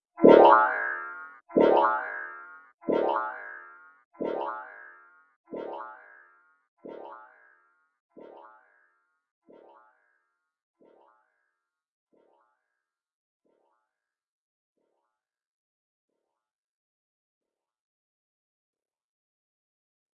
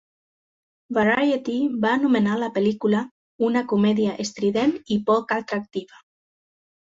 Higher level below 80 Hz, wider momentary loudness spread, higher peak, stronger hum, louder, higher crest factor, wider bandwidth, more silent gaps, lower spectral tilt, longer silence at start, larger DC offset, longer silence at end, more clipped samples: second, -74 dBFS vs -64 dBFS; first, 28 LU vs 8 LU; first, -2 dBFS vs -6 dBFS; neither; about the same, -23 LUFS vs -22 LUFS; first, 28 dB vs 16 dB; second, 5.8 kHz vs 7.8 kHz; about the same, 2.74-2.78 s, 4.05-4.11 s, 5.36-5.44 s, 6.68-6.77 s vs 3.11-3.39 s; second, -4 dB/octave vs -6 dB/octave; second, 0.2 s vs 0.9 s; neither; first, 13 s vs 1 s; neither